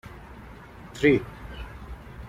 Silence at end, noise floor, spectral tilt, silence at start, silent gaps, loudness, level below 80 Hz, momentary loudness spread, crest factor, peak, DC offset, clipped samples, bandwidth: 0 s; -44 dBFS; -6.5 dB/octave; 0.05 s; none; -23 LUFS; -44 dBFS; 23 LU; 22 dB; -6 dBFS; under 0.1%; under 0.1%; 14.5 kHz